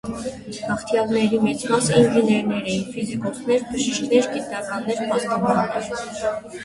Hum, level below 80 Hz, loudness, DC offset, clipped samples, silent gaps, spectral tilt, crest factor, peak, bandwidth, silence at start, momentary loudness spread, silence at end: none; -54 dBFS; -22 LUFS; under 0.1%; under 0.1%; none; -5 dB/octave; 18 dB; -4 dBFS; 11.5 kHz; 0.05 s; 11 LU; 0 s